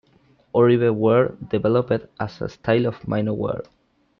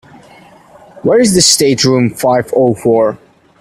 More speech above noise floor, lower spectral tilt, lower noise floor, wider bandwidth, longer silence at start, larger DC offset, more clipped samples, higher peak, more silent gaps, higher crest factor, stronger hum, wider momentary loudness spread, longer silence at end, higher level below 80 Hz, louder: first, 38 dB vs 30 dB; first, -9 dB/octave vs -4 dB/octave; first, -58 dBFS vs -40 dBFS; second, 6.4 kHz vs 16.5 kHz; second, 0.55 s vs 1.05 s; neither; neither; second, -6 dBFS vs 0 dBFS; neither; about the same, 16 dB vs 12 dB; neither; first, 12 LU vs 8 LU; about the same, 0.55 s vs 0.45 s; second, -54 dBFS vs -46 dBFS; second, -21 LUFS vs -10 LUFS